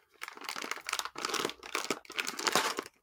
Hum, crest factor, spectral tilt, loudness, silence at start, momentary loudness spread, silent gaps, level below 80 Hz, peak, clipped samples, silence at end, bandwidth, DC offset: none; 26 dB; -0.5 dB/octave; -34 LUFS; 0.2 s; 10 LU; none; -76 dBFS; -10 dBFS; under 0.1%; 0.15 s; 19 kHz; under 0.1%